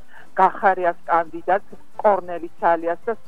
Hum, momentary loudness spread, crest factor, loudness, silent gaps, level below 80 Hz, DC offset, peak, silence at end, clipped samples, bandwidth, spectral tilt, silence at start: none; 8 LU; 18 dB; -21 LUFS; none; -64 dBFS; 2%; -2 dBFS; 0.15 s; under 0.1%; 9.2 kHz; -7 dB/octave; 0.35 s